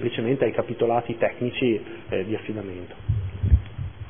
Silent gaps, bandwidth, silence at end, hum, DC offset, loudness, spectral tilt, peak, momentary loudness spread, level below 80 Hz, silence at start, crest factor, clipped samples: none; 3.6 kHz; 0 s; none; 0.5%; -26 LUFS; -11.5 dB/octave; -6 dBFS; 11 LU; -32 dBFS; 0 s; 20 dB; under 0.1%